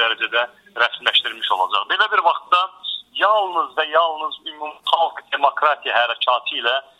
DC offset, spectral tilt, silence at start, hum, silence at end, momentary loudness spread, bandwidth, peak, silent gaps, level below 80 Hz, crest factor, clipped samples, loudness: under 0.1%; -1 dB/octave; 0 s; none; 0.2 s; 9 LU; 13.5 kHz; 0 dBFS; none; -74 dBFS; 20 dB; under 0.1%; -19 LUFS